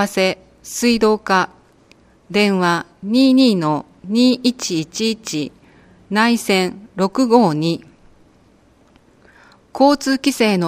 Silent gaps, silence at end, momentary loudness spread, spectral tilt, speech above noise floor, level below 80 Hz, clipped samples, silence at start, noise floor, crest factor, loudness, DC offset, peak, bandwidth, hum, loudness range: none; 0 s; 11 LU; -4.5 dB/octave; 36 dB; -54 dBFS; under 0.1%; 0 s; -52 dBFS; 18 dB; -17 LUFS; under 0.1%; 0 dBFS; 15.5 kHz; none; 3 LU